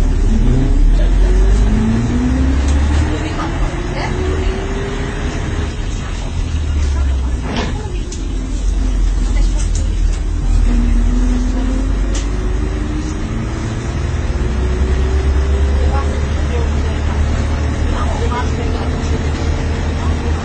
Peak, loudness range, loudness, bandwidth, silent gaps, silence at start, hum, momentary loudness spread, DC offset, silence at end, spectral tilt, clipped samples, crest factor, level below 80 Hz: -2 dBFS; 4 LU; -18 LUFS; 9 kHz; none; 0 s; none; 6 LU; under 0.1%; 0 s; -6.5 dB/octave; under 0.1%; 12 dB; -16 dBFS